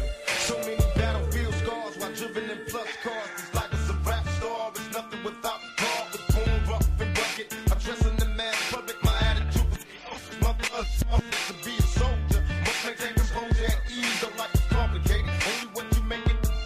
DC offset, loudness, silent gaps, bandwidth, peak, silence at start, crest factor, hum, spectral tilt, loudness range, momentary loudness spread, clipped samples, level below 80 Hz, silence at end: under 0.1%; -28 LUFS; none; 15.5 kHz; -10 dBFS; 0 s; 16 dB; none; -4.5 dB/octave; 4 LU; 8 LU; under 0.1%; -28 dBFS; 0 s